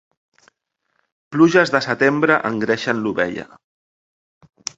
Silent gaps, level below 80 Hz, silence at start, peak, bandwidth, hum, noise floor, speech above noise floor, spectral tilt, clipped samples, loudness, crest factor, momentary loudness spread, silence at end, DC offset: none; -60 dBFS; 1.3 s; 0 dBFS; 8 kHz; none; -73 dBFS; 56 dB; -5 dB/octave; under 0.1%; -17 LUFS; 20 dB; 12 LU; 1.35 s; under 0.1%